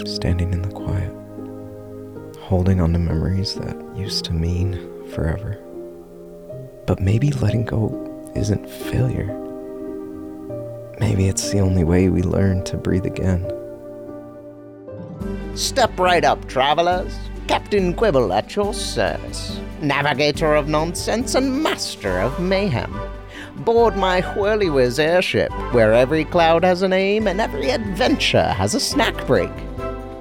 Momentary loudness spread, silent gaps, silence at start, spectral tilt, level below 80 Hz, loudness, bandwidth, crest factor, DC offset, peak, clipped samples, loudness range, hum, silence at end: 18 LU; none; 0 s; -5.5 dB/octave; -36 dBFS; -20 LUFS; 17 kHz; 16 dB; under 0.1%; -4 dBFS; under 0.1%; 7 LU; none; 0 s